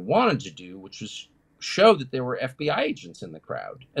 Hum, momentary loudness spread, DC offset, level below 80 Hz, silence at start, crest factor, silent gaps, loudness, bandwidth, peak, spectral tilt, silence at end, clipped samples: none; 22 LU; under 0.1%; -66 dBFS; 0 s; 20 dB; none; -24 LUFS; 11.5 kHz; -4 dBFS; -5 dB/octave; 0 s; under 0.1%